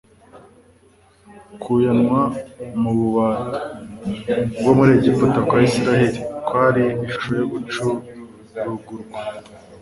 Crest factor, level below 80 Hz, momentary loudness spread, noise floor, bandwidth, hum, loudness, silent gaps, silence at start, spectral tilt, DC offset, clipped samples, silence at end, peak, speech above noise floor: 18 dB; -48 dBFS; 17 LU; -53 dBFS; 11.5 kHz; none; -19 LUFS; none; 0.35 s; -7 dB/octave; under 0.1%; under 0.1%; 0.05 s; -2 dBFS; 35 dB